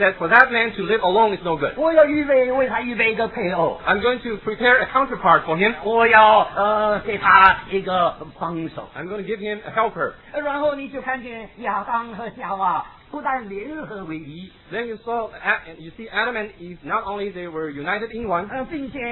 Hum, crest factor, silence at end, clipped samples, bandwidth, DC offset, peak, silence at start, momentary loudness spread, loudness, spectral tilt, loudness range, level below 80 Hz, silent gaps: none; 20 dB; 0 s; under 0.1%; 5.4 kHz; under 0.1%; 0 dBFS; 0 s; 17 LU; -19 LUFS; -8 dB/octave; 11 LU; -50 dBFS; none